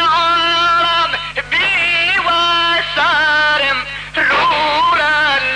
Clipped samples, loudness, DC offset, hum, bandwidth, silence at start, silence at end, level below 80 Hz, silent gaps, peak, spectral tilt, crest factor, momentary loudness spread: under 0.1%; -13 LUFS; under 0.1%; 50 Hz at -40 dBFS; 10 kHz; 0 s; 0 s; -42 dBFS; none; -8 dBFS; -2 dB/octave; 6 dB; 4 LU